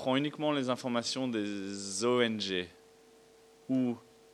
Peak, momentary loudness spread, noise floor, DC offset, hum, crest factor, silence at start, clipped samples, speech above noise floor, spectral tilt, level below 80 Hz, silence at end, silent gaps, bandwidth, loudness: -14 dBFS; 9 LU; -60 dBFS; under 0.1%; none; 20 dB; 0 s; under 0.1%; 28 dB; -4 dB/octave; -78 dBFS; 0.35 s; none; 12.5 kHz; -33 LUFS